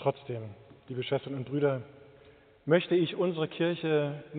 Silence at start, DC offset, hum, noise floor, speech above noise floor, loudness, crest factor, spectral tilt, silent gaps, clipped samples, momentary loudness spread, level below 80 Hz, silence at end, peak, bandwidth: 0 s; under 0.1%; none; -58 dBFS; 28 dB; -31 LUFS; 20 dB; -5.5 dB/octave; none; under 0.1%; 14 LU; -72 dBFS; 0 s; -12 dBFS; 4.6 kHz